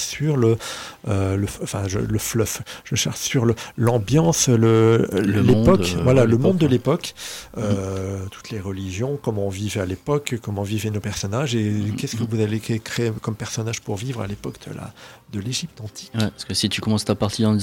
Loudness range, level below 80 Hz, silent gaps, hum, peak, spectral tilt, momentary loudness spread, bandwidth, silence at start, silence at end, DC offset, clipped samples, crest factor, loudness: 9 LU; -44 dBFS; none; none; -4 dBFS; -5.5 dB/octave; 14 LU; 17 kHz; 0 s; 0 s; under 0.1%; under 0.1%; 18 dB; -22 LUFS